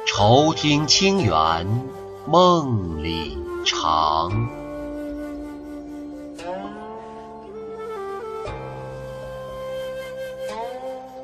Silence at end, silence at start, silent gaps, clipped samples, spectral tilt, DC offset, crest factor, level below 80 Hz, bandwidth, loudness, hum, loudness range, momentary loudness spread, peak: 0 s; 0 s; none; under 0.1%; -4.5 dB/octave; under 0.1%; 20 dB; -44 dBFS; 13 kHz; -22 LUFS; none; 14 LU; 19 LU; -4 dBFS